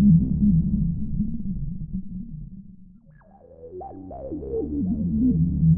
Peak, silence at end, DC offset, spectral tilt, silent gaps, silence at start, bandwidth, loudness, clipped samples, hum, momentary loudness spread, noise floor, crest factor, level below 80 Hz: -8 dBFS; 0 s; under 0.1%; -16.5 dB/octave; none; 0 s; 1.1 kHz; -24 LUFS; under 0.1%; none; 19 LU; -51 dBFS; 16 dB; -36 dBFS